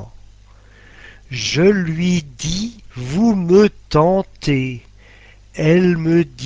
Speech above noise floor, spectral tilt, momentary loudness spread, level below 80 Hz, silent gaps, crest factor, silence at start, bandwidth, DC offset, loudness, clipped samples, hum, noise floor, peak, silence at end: 29 dB; -6 dB/octave; 14 LU; -40 dBFS; none; 18 dB; 0 s; 8 kHz; under 0.1%; -16 LUFS; under 0.1%; none; -45 dBFS; 0 dBFS; 0 s